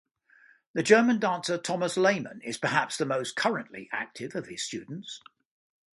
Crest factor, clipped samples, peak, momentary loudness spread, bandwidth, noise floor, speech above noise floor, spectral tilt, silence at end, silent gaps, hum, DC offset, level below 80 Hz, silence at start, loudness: 24 dB; under 0.1%; -6 dBFS; 16 LU; 11.5 kHz; -60 dBFS; 33 dB; -4 dB/octave; 0.75 s; none; none; under 0.1%; -74 dBFS; 0.75 s; -28 LUFS